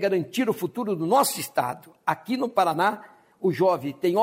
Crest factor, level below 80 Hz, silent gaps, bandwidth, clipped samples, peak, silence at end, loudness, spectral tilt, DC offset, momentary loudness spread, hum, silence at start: 16 dB; -72 dBFS; none; 16 kHz; under 0.1%; -8 dBFS; 0 s; -25 LUFS; -4.5 dB/octave; under 0.1%; 7 LU; none; 0 s